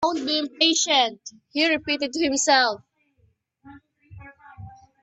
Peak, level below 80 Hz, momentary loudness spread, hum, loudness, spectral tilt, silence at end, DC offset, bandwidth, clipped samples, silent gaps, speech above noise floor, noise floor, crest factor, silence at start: -4 dBFS; -62 dBFS; 9 LU; none; -21 LUFS; -1 dB/octave; 0.3 s; under 0.1%; 8.6 kHz; under 0.1%; none; 43 dB; -65 dBFS; 20 dB; 0 s